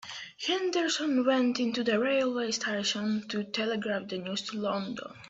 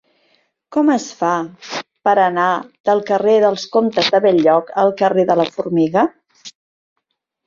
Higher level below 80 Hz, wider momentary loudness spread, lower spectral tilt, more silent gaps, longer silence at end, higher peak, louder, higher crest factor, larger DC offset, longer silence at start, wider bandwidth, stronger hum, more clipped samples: second, -74 dBFS vs -62 dBFS; about the same, 8 LU vs 7 LU; second, -3.5 dB/octave vs -5 dB/octave; second, none vs 2.80-2.84 s; second, 0 s vs 0.95 s; second, -14 dBFS vs -2 dBFS; second, -30 LUFS vs -16 LUFS; about the same, 16 dB vs 14 dB; neither; second, 0 s vs 0.7 s; about the same, 8.2 kHz vs 7.6 kHz; neither; neither